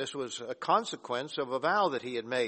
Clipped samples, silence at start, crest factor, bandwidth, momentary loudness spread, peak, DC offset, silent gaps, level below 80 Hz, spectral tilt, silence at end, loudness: under 0.1%; 0 s; 18 dB; 8.8 kHz; 9 LU; -14 dBFS; under 0.1%; none; -76 dBFS; -3.5 dB/octave; 0 s; -31 LUFS